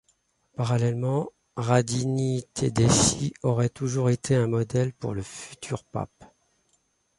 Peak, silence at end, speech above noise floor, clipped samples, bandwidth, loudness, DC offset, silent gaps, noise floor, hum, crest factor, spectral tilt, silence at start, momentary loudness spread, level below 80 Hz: -6 dBFS; 0.95 s; 45 dB; under 0.1%; 11.5 kHz; -26 LUFS; under 0.1%; none; -70 dBFS; none; 20 dB; -5 dB/octave; 0.6 s; 14 LU; -50 dBFS